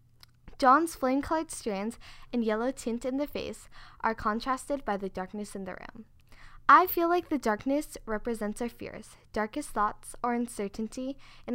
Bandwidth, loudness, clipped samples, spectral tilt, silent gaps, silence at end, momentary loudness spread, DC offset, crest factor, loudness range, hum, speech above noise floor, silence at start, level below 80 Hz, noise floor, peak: 16 kHz; -30 LUFS; under 0.1%; -4.5 dB/octave; none; 0 s; 17 LU; under 0.1%; 24 dB; 6 LU; none; 24 dB; 0.45 s; -52 dBFS; -54 dBFS; -6 dBFS